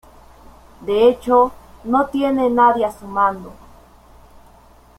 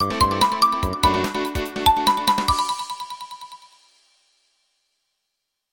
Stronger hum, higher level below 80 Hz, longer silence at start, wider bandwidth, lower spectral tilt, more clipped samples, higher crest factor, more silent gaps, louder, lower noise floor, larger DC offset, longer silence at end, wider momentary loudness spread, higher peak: neither; second, -48 dBFS vs -38 dBFS; first, 0.8 s vs 0 s; second, 14.5 kHz vs 17.5 kHz; first, -6 dB/octave vs -3.5 dB/octave; neither; about the same, 18 dB vs 20 dB; neither; first, -17 LUFS vs -20 LUFS; second, -48 dBFS vs -79 dBFS; neither; second, 1.45 s vs 2.15 s; second, 10 LU vs 17 LU; about the same, -2 dBFS vs -4 dBFS